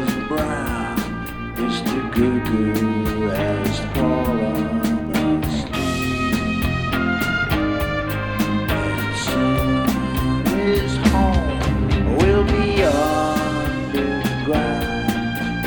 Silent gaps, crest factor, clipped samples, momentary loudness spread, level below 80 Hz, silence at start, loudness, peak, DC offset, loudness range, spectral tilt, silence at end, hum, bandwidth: none; 16 dB; under 0.1%; 6 LU; -30 dBFS; 0 s; -20 LUFS; -4 dBFS; under 0.1%; 3 LU; -6 dB/octave; 0 s; none; 19.5 kHz